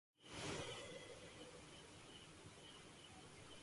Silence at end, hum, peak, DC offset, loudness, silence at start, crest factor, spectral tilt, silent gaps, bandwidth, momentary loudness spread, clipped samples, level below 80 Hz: 0 s; none; -36 dBFS; under 0.1%; -55 LUFS; 0.2 s; 20 dB; -3 dB/octave; none; 11.5 kHz; 11 LU; under 0.1%; -72 dBFS